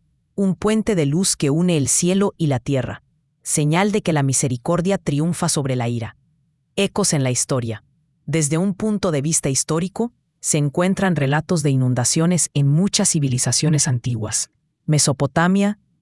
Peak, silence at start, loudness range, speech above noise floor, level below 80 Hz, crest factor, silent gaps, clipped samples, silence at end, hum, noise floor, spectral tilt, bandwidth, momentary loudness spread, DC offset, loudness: -2 dBFS; 0.35 s; 4 LU; 45 dB; -50 dBFS; 18 dB; none; under 0.1%; 0.3 s; none; -64 dBFS; -4.5 dB/octave; 12 kHz; 8 LU; under 0.1%; -19 LUFS